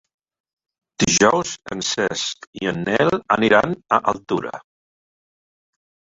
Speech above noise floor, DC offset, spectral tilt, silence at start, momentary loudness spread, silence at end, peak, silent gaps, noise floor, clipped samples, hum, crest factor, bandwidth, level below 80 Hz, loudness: over 70 dB; under 0.1%; -3.5 dB/octave; 1 s; 11 LU; 1.55 s; -2 dBFS; 2.47-2.53 s; under -90 dBFS; under 0.1%; none; 20 dB; 8 kHz; -54 dBFS; -19 LUFS